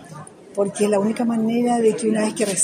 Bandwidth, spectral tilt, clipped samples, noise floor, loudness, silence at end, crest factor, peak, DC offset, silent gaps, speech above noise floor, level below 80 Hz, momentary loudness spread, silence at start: 15.5 kHz; -4.5 dB/octave; under 0.1%; -40 dBFS; -20 LUFS; 0 s; 16 dB; -4 dBFS; under 0.1%; none; 20 dB; -66 dBFS; 12 LU; 0 s